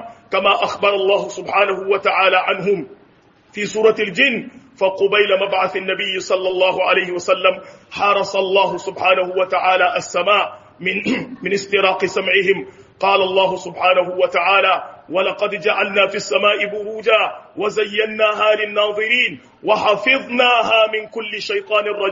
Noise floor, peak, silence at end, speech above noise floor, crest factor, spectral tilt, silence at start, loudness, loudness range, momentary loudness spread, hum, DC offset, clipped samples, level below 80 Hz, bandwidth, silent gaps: -52 dBFS; 0 dBFS; 0 s; 35 dB; 16 dB; -0.5 dB/octave; 0 s; -17 LUFS; 2 LU; 8 LU; none; under 0.1%; under 0.1%; -64 dBFS; 7.6 kHz; none